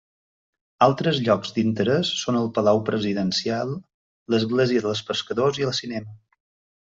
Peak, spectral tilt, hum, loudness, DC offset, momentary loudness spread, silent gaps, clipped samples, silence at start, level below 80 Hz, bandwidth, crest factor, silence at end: -4 dBFS; -5.5 dB/octave; none; -23 LUFS; under 0.1%; 7 LU; 3.94-4.26 s; under 0.1%; 0.8 s; -62 dBFS; 7.8 kHz; 20 dB; 0.8 s